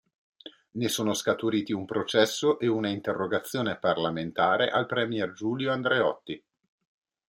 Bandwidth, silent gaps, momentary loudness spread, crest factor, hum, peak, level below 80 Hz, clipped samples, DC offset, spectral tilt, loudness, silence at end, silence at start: 16.5 kHz; none; 6 LU; 20 dB; none; -8 dBFS; -70 dBFS; under 0.1%; under 0.1%; -4.5 dB/octave; -27 LUFS; 0.9 s; 0.45 s